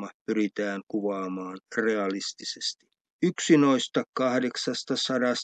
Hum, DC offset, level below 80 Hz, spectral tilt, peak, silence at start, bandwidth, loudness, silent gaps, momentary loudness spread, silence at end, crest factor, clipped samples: none; under 0.1%; -82 dBFS; -4 dB/octave; -8 dBFS; 0 s; 9.4 kHz; -27 LUFS; 0.14-0.26 s, 0.83-0.87 s, 3.01-3.05 s, 3.11-3.19 s, 4.08-4.13 s; 11 LU; 0 s; 18 dB; under 0.1%